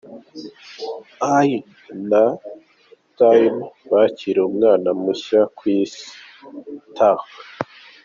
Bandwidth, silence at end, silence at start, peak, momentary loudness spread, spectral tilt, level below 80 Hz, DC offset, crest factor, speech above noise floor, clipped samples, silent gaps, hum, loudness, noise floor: 7.4 kHz; 0.4 s; 0.1 s; -2 dBFS; 21 LU; -5 dB/octave; -68 dBFS; under 0.1%; 16 dB; 36 dB; under 0.1%; none; none; -18 LUFS; -53 dBFS